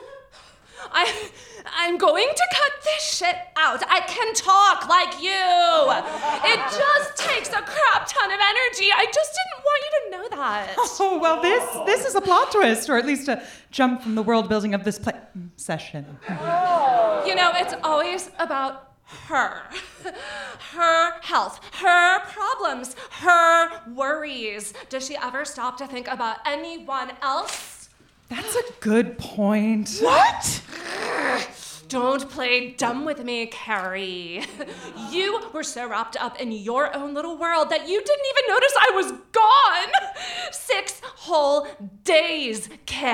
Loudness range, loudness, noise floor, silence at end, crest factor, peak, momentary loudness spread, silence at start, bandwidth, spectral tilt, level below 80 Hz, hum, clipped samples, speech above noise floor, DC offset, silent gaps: 8 LU; -21 LUFS; -51 dBFS; 0 s; 20 dB; -2 dBFS; 15 LU; 0 s; 17 kHz; -2.5 dB/octave; -60 dBFS; none; under 0.1%; 29 dB; under 0.1%; none